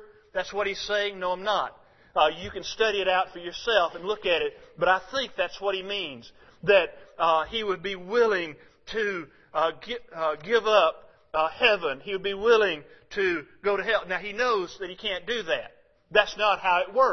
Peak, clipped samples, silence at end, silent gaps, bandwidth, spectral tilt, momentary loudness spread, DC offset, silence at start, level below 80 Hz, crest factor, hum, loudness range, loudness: -4 dBFS; under 0.1%; 0 s; none; 6.4 kHz; -3.5 dB/octave; 11 LU; under 0.1%; 0 s; -58 dBFS; 22 dB; none; 3 LU; -26 LUFS